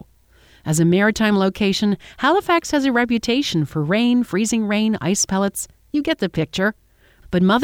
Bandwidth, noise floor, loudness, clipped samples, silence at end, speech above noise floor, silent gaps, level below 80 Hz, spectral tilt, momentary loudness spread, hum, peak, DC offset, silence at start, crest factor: 17 kHz; -53 dBFS; -19 LUFS; under 0.1%; 0 s; 34 dB; none; -48 dBFS; -4.5 dB/octave; 7 LU; none; -4 dBFS; under 0.1%; 0.65 s; 16 dB